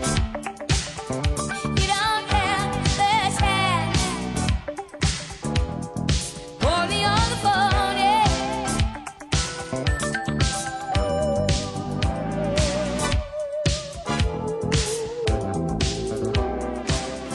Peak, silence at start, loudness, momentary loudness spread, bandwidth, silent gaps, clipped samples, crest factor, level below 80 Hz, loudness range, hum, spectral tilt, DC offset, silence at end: -8 dBFS; 0 s; -24 LUFS; 8 LU; 13 kHz; none; under 0.1%; 16 dB; -32 dBFS; 4 LU; none; -4 dB/octave; under 0.1%; 0 s